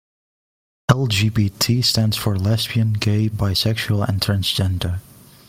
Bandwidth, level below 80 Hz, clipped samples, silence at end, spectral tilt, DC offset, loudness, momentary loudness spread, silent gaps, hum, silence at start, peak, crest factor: 16.5 kHz; -44 dBFS; under 0.1%; 0.5 s; -5 dB/octave; under 0.1%; -19 LUFS; 5 LU; none; none; 0.9 s; 0 dBFS; 20 dB